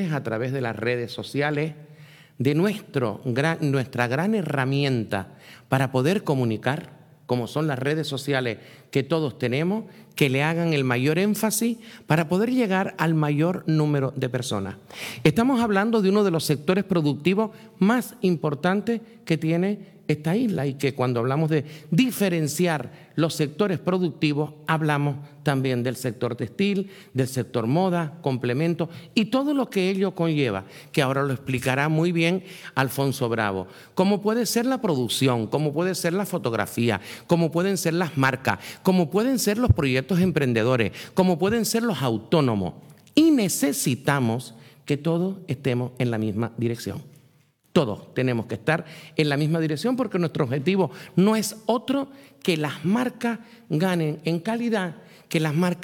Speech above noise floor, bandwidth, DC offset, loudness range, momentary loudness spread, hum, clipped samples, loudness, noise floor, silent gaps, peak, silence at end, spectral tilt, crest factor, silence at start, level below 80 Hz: 37 dB; 19 kHz; under 0.1%; 4 LU; 7 LU; none; under 0.1%; -24 LUFS; -60 dBFS; none; -6 dBFS; 0 s; -6 dB/octave; 18 dB; 0 s; -56 dBFS